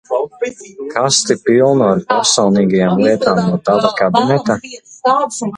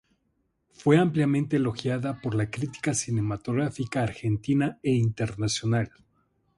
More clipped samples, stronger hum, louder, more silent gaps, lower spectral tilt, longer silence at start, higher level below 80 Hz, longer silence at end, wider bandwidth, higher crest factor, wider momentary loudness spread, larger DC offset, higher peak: neither; neither; first, -14 LUFS vs -27 LUFS; neither; second, -4.5 dB/octave vs -6 dB/octave; second, 0.1 s vs 0.8 s; about the same, -54 dBFS vs -56 dBFS; second, 0 s vs 0.7 s; about the same, 11 kHz vs 11.5 kHz; second, 14 dB vs 20 dB; first, 10 LU vs 7 LU; neither; first, 0 dBFS vs -8 dBFS